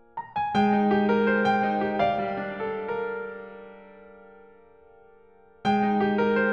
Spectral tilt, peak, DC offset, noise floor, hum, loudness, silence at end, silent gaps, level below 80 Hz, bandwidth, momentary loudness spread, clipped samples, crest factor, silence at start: -7.5 dB/octave; -12 dBFS; under 0.1%; -56 dBFS; none; -25 LUFS; 0 s; none; -58 dBFS; 7 kHz; 14 LU; under 0.1%; 16 dB; 0.15 s